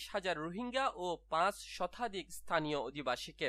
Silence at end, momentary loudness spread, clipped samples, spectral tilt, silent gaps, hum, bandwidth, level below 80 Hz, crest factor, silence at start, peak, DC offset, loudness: 0 s; 7 LU; under 0.1%; -4 dB/octave; none; none; 15 kHz; -64 dBFS; 20 dB; 0 s; -18 dBFS; under 0.1%; -38 LUFS